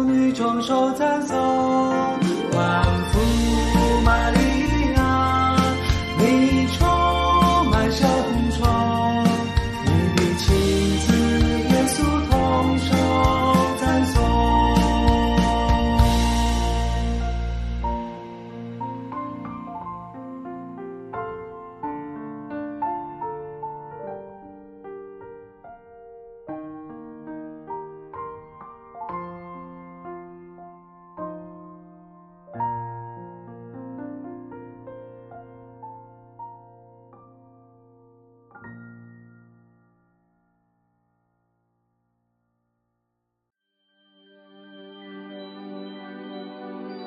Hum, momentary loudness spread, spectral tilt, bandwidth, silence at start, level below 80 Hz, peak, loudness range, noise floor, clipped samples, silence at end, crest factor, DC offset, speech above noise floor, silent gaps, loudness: none; 22 LU; -6 dB/octave; 14 kHz; 0 s; -30 dBFS; -4 dBFS; 21 LU; -78 dBFS; under 0.1%; 0 s; 20 dB; under 0.1%; 58 dB; none; -20 LUFS